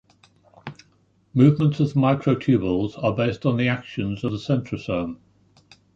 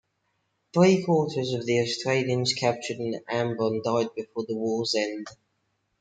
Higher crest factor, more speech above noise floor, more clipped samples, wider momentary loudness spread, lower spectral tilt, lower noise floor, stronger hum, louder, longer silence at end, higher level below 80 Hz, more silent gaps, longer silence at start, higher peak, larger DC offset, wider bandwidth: about the same, 20 dB vs 20 dB; second, 40 dB vs 49 dB; neither; first, 19 LU vs 11 LU; first, -8.5 dB/octave vs -5 dB/octave; second, -61 dBFS vs -75 dBFS; neither; first, -22 LUFS vs -26 LUFS; first, 0.8 s vs 0.65 s; first, -52 dBFS vs -70 dBFS; neither; about the same, 0.65 s vs 0.75 s; first, -4 dBFS vs -8 dBFS; neither; second, 7.4 kHz vs 9.4 kHz